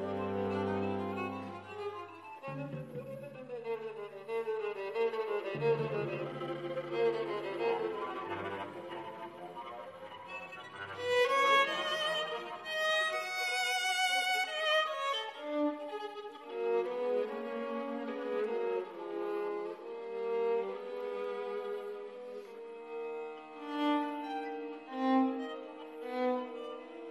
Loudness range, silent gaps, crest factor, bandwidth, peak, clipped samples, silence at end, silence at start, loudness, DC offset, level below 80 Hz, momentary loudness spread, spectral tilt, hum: 9 LU; none; 18 dB; 14 kHz; -18 dBFS; under 0.1%; 0 s; 0 s; -35 LUFS; under 0.1%; -72 dBFS; 15 LU; -4 dB/octave; none